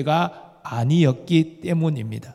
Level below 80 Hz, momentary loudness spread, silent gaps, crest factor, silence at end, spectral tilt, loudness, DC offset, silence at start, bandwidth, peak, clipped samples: -64 dBFS; 11 LU; none; 16 dB; 0 s; -7.5 dB/octave; -22 LUFS; under 0.1%; 0 s; 11.5 kHz; -4 dBFS; under 0.1%